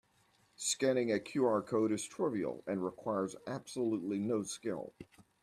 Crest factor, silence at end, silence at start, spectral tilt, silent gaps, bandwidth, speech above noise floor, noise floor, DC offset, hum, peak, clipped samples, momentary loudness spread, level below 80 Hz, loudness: 16 dB; 0.4 s; 0.6 s; -4.5 dB/octave; none; 14 kHz; 36 dB; -71 dBFS; under 0.1%; none; -20 dBFS; under 0.1%; 9 LU; -76 dBFS; -36 LUFS